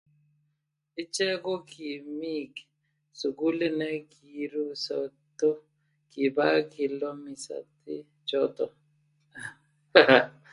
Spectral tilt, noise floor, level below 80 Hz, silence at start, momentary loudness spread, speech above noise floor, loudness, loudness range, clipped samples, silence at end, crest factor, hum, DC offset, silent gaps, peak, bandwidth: -4 dB/octave; -78 dBFS; -74 dBFS; 0.95 s; 20 LU; 51 dB; -27 LUFS; 7 LU; under 0.1%; 0.2 s; 28 dB; none; under 0.1%; none; 0 dBFS; 11.5 kHz